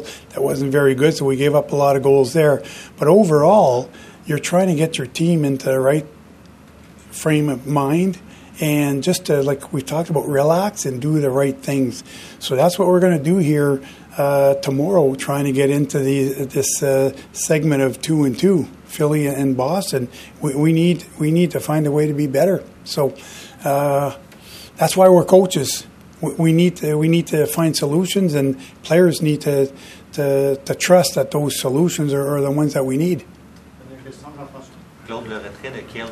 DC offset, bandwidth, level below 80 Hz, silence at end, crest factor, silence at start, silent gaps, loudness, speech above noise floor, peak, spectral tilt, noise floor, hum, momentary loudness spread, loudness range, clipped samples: under 0.1%; 15 kHz; -54 dBFS; 0 s; 18 dB; 0 s; none; -17 LUFS; 27 dB; 0 dBFS; -6 dB/octave; -44 dBFS; none; 15 LU; 5 LU; under 0.1%